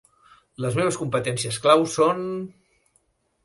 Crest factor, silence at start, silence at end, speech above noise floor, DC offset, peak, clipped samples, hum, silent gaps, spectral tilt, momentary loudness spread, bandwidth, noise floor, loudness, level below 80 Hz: 22 dB; 0.6 s; 0.95 s; 45 dB; under 0.1%; -4 dBFS; under 0.1%; none; none; -4.5 dB/octave; 13 LU; 11.5 kHz; -67 dBFS; -23 LUFS; -62 dBFS